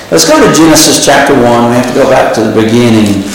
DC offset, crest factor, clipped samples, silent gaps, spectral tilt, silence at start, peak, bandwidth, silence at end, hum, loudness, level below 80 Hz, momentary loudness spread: under 0.1%; 6 dB; 1%; none; -4 dB/octave; 0 s; 0 dBFS; over 20 kHz; 0 s; none; -5 LUFS; -34 dBFS; 5 LU